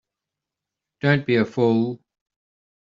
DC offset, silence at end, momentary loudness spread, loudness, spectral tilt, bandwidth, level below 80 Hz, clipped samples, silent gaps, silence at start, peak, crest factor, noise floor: under 0.1%; 0.95 s; 8 LU; -21 LUFS; -6 dB/octave; 7.4 kHz; -64 dBFS; under 0.1%; none; 1.05 s; -4 dBFS; 20 dB; -86 dBFS